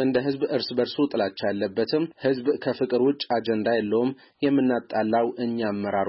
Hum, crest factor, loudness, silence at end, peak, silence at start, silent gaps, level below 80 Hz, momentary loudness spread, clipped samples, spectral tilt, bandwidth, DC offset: none; 12 dB; -25 LUFS; 0 s; -12 dBFS; 0 s; none; -66 dBFS; 4 LU; under 0.1%; -10 dB/octave; 5.8 kHz; under 0.1%